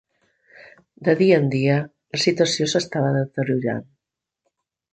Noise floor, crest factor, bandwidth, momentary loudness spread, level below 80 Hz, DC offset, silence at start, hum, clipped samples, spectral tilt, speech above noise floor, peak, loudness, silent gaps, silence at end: -83 dBFS; 20 dB; 9.2 kHz; 9 LU; -64 dBFS; under 0.1%; 0.6 s; none; under 0.1%; -5.5 dB/octave; 64 dB; -2 dBFS; -21 LUFS; none; 1.1 s